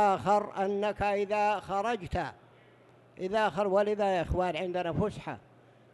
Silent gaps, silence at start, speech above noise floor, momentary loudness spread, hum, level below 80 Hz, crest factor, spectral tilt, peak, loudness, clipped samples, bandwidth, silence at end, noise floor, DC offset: none; 0 s; 29 dB; 10 LU; none; -48 dBFS; 16 dB; -6 dB/octave; -14 dBFS; -30 LUFS; under 0.1%; 12 kHz; 0.55 s; -59 dBFS; under 0.1%